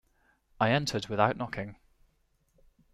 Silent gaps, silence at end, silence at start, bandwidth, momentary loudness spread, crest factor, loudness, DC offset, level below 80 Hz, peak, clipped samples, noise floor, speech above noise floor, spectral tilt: none; 1.2 s; 0.6 s; 14 kHz; 12 LU; 24 dB; -30 LUFS; under 0.1%; -60 dBFS; -10 dBFS; under 0.1%; -71 dBFS; 42 dB; -5 dB/octave